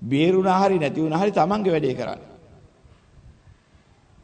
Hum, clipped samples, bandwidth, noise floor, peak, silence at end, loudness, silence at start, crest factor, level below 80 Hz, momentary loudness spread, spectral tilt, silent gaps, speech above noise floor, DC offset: none; under 0.1%; 9.2 kHz; -56 dBFS; -6 dBFS; 2 s; -21 LUFS; 0 s; 16 dB; -56 dBFS; 11 LU; -7 dB/octave; none; 36 dB; under 0.1%